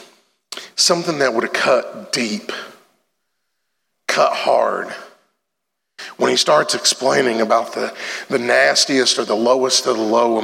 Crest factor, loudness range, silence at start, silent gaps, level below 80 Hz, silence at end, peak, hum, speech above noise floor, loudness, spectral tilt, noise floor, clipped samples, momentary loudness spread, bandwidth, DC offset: 18 dB; 6 LU; 0 s; none; -80 dBFS; 0 s; -2 dBFS; none; 61 dB; -16 LUFS; -2 dB/octave; -78 dBFS; under 0.1%; 16 LU; 16.5 kHz; under 0.1%